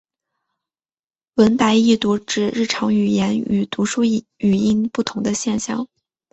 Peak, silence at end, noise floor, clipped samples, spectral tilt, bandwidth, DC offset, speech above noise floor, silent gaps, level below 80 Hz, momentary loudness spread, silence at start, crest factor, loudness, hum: -2 dBFS; 0.5 s; under -90 dBFS; under 0.1%; -5 dB/octave; 8.2 kHz; under 0.1%; over 72 dB; none; -54 dBFS; 7 LU; 1.35 s; 18 dB; -19 LUFS; none